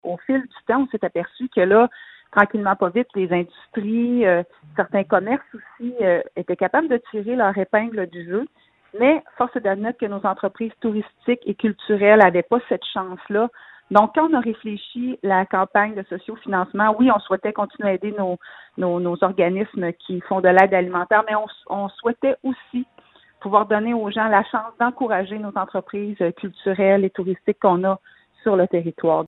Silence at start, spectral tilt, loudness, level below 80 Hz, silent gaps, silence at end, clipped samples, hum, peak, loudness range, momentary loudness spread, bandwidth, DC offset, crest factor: 0.05 s; -8.5 dB/octave; -21 LUFS; -64 dBFS; none; 0 s; under 0.1%; none; 0 dBFS; 3 LU; 11 LU; 4.6 kHz; under 0.1%; 20 dB